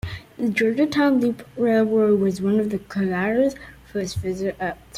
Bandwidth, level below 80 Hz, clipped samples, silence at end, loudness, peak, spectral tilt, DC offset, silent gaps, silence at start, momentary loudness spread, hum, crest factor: 15.5 kHz; -50 dBFS; under 0.1%; 0 s; -22 LUFS; -8 dBFS; -6.5 dB/octave; under 0.1%; none; 0.05 s; 10 LU; none; 14 dB